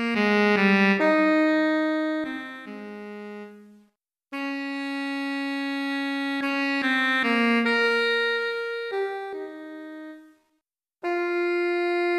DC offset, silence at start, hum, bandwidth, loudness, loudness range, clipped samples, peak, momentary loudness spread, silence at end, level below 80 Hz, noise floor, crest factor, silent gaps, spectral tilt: under 0.1%; 0 s; none; 13.5 kHz; -24 LUFS; 9 LU; under 0.1%; -8 dBFS; 18 LU; 0 s; -76 dBFS; -78 dBFS; 18 dB; none; -5.5 dB/octave